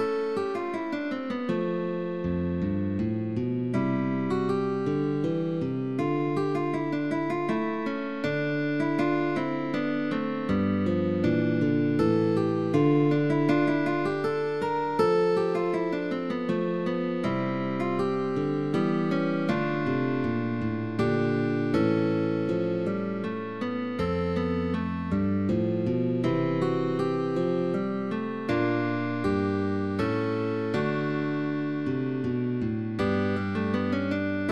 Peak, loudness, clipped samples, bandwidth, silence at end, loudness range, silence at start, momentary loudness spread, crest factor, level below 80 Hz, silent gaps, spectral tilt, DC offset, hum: -10 dBFS; -27 LUFS; under 0.1%; 9.8 kHz; 0 s; 4 LU; 0 s; 5 LU; 16 dB; -56 dBFS; none; -8.5 dB/octave; 0.3%; none